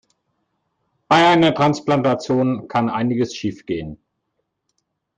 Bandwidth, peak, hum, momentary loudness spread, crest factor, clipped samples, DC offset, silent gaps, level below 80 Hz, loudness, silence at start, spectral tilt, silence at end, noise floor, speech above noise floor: 9.2 kHz; -4 dBFS; none; 14 LU; 16 dB; under 0.1%; under 0.1%; none; -56 dBFS; -18 LUFS; 1.1 s; -6 dB/octave; 1.2 s; -74 dBFS; 56 dB